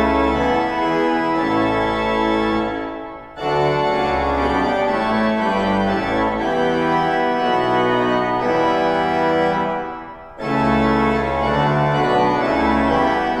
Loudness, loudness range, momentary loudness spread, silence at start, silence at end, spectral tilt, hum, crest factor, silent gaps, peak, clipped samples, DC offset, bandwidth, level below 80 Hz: -18 LUFS; 2 LU; 5 LU; 0 s; 0 s; -6.5 dB/octave; none; 14 dB; none; -4 dBFS; under 0.1%; under 0.1%; 11.5 kHz; -38 dBFS